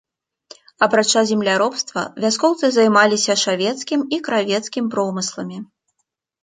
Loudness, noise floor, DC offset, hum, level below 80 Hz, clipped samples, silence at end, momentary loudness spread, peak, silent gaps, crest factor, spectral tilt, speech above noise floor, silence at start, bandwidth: -18 LUFS; -74 dBFS; under 0.1%; none; -68 dBFS; under 0.1%; 0.8 s; 10 LU; -2 dBFS; none; 18 dB; -3 dB/octave; 56 dB; 0.8 s; 9.6 kHz